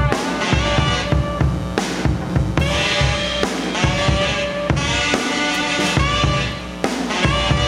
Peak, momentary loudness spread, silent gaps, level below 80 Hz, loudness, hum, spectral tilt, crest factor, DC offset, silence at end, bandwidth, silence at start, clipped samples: 0 dBFS; 4 LU; none; -28 dBFS; -18 LUFS; none; -4.5 dB/octave; 18 dB; under 0.1%; 0 s; 14 kHz; 0 s; under 0.1%